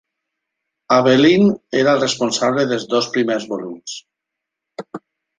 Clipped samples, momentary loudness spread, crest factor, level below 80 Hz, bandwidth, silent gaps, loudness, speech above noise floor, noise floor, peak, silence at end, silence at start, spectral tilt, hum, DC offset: under 0.1%; 21 LU; 18 dB; -60 dBFS; 9.6 kHz; none; -16 LUFS; 66 dB; -82 dBFS; -2 dBFS; 0.4 s; 0.9 s; -4.5 dB/octave; none; under 0.1%